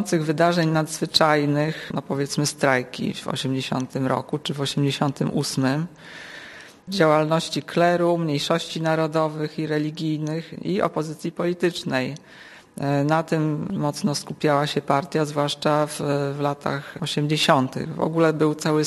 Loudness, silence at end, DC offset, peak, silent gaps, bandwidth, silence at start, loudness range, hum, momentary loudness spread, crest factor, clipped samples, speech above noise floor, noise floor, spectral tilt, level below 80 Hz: -23 LUFS; 0 s; under 0.1%; -2 dBFS; none; 13 kHz; 0 s; 3 LU; none; 10 LU; 20 dB; under 0.1%; 20 dB; -43 dBFS; -5.5 dB/octave; -62 dBFS